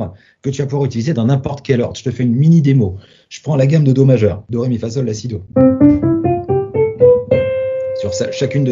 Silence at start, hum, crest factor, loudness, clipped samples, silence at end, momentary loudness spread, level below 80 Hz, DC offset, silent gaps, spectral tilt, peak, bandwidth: 0 s; none; 14 dB; -14 LUFS; under 0.1%; 0 s; 10 LU; -42 dBFS; under 0.1%; none; -8 dB/octave; 0 dBFS; 7.6 kHz